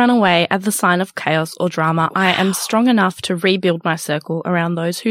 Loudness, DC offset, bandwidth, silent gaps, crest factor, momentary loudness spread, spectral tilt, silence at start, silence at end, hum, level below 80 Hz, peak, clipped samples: -17 LUFS; under 0.1%; 16 kHz; none; 16 dB; 6 LU; -4.5 dB/octave; 0 s; 0 s; none; -62 dBFS; 0 dBFS; under 0.1%